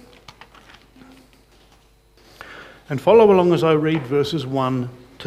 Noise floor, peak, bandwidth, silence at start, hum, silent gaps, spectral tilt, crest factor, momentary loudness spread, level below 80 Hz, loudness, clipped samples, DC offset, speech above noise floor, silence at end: -54 dBFS; -2 dBFS; 14 kHz; 2.5 s; none; none; -7.5 dB/octave; 18 dB; 26 LU; -54 dBFS; -17 LUFS; under 0.1%; under 0.1%; 37 dB; 0 s